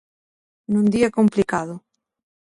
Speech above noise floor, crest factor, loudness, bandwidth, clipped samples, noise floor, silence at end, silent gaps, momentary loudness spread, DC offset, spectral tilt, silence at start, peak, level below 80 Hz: over 71 dB; 16 dB; -20 LUFS; 11.5 kHz; under 0.1%; under -90 dBFS; 0.75 s; none; 14 LU; under 0.1%; -7 dB/octave; 0.7 s; -6 dBFS; -56 dBFS